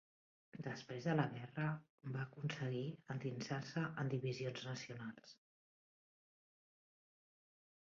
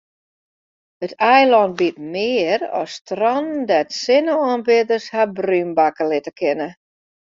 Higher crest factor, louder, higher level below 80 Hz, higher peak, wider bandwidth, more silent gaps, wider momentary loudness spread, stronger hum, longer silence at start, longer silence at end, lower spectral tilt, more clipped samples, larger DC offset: first, 24 dB vs 16 dB; second, -44 LUFS vs -18 LUFS; second, -82 dBFS vs -66 dBFS; second, -22 dBFS vs -2 dBFS; about the same, 7.4 kHz vs 7.6 kHz; about the same, 1.90-1.98 s vs 3.01-3.05 s; about the same, 11 LU vs 10 LU; neither; second, 0.55 s vs 1 s; first, 2.6 s vs 0.5 s; first, -6 dB/octave vs -2.5 dB/octave; neither; neither